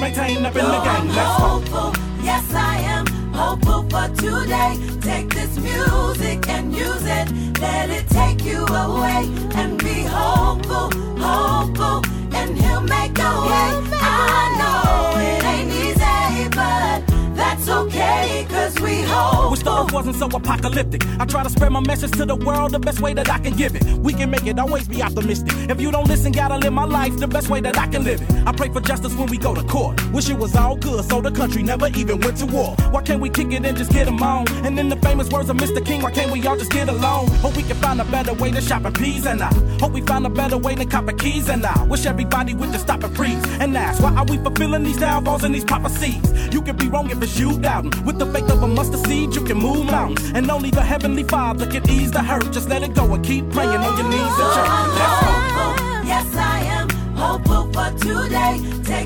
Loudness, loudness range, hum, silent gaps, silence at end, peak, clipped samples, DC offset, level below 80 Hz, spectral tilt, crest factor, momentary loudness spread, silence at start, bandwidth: -19 LUFS; 3 LU; none; none; 0 s; -4 dBFS; under 0.1%; under 0.1%; -24 dBFS; -5 dB/octave; 14 dB; 5 LU; 0 s; 18 kHz